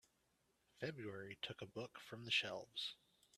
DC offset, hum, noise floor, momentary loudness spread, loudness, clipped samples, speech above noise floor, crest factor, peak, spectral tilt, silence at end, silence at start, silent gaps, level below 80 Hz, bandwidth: under 0.1%; none; -82 dBFS; 13 LU; -46 LUFS; under 0.1%; 35 dB; 24 dB; -26 dBFS; -3.5 dB/octave; 0 s; 0.75 s; none; -84 dBFS; 14.5 kHz